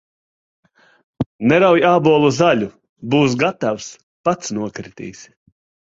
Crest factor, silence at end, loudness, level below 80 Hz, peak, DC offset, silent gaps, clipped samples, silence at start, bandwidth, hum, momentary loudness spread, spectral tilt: 16 dB; 0.7 s; -16 LUFS; -54 dBFS; -2 dBFS; under 0.1%; 1.26-1.39 s, 2.89-2.96 s, 4.03-4.24 s; under 0.1%; 1.2 s; 7.8 kHz; none; 20 LU; -5.5 dB/octave